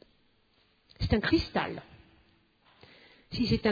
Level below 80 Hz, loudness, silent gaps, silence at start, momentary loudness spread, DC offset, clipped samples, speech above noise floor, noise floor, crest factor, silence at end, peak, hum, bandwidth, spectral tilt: -46 dBFS; -30 LUFS; none; 1 s; 13 LU; under 0.1%; under 0.1%; 40 dB; -68 dBFS; 20 dB; 0 s; -14 dBFS; none; 5 kHz; -7 dB/octave